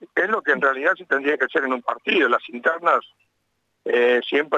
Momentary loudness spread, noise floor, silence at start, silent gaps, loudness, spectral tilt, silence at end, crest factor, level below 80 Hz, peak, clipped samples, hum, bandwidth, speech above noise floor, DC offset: 5 LU; -72 dBFS; 0 s; none; -20 LUFS; -4.5 dB/octave; 0 s; 16 dB; -80 dBFS; -6 dBFS; under 0.1%; none; 8 kHz; 51 dB; under 0.1%